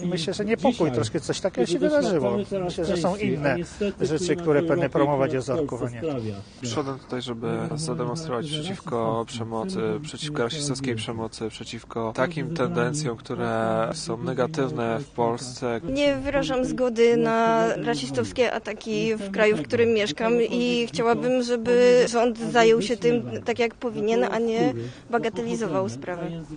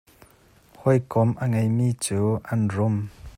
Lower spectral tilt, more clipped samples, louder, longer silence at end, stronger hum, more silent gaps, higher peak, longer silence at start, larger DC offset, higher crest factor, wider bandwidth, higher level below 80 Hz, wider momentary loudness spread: second, -5.5 dB/octave vs -7 dB/octave; neither; about the same, -25 LUFS vs -24 LUFS; about the same, 0 s vs 0.05 s; neither; neither; about the same, -4 dBFS vs -6 dBFS; second, 0 s vs 0.8 s; neither; about the same, 20 dB vs 18 dB; second, 10 kHz vs 14 kHz; about the same, -52 dBFS vs -54 dBFS; first, 9 LU vs 4 LU